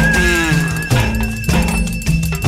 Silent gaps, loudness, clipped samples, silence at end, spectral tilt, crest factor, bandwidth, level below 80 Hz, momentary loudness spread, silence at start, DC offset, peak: none; -16 LUFS; under 0.1%; 0 s; -5 dB/octave; 12 dB; 16 kHz; -22 dBFS; 5 LU; 0 s; under 0.1%; -2 dBFS